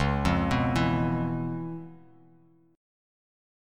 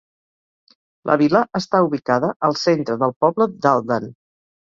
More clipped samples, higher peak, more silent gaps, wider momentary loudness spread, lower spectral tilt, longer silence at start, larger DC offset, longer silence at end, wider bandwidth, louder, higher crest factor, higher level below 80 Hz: neither; second, -10 dBFS vs -2 dBFS; second, none vs 2.36-2.40 s, 3.16-3.21 s; first, 14 LU vs 7 LU; about the same, -7 dB/octave vs -6 dB/octave; second, 0 s vs 1.05 s; neither; first, 1 s vs 0.55 s; first, 13 kHz vs 7.6 kHz; second, -28 LUFS vs -19 LUFS; about the same, 18 dB vs 18 dB; first, -42 dBFS vs -62 dBFS